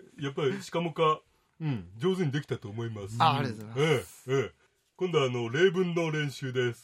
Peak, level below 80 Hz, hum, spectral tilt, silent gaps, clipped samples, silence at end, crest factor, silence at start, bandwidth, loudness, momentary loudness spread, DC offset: -8 dBFS; -70 dBFS; none; -6 dB/octave; none; under 0.1%; 0.05 s; 20 dB; 0.15 s; 16 kHz; -30 LUFS; 11 LU; under 0.1%